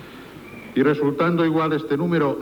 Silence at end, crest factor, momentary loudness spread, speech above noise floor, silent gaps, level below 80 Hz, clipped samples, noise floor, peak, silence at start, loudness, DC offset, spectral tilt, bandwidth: 0 s; 14 dB; 20 LU; 20 dB; none; -58 dBFS; under 0.1%; -40 dBFS; -6 dBFS; 0 s; -21 LUFS; under 0.1%; -8 dB/octave; 20 kHz